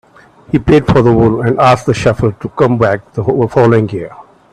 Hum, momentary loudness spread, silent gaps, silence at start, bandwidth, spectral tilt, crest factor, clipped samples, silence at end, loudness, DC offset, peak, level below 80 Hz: none; 8 LU; none; 0.55 s; 10.5 kHz; -7.5 dB/octave; 12 dB; under 0.1%; 0.3 s; -11 LUFS; under 0.1%; 0 dBFS; -34 dBFS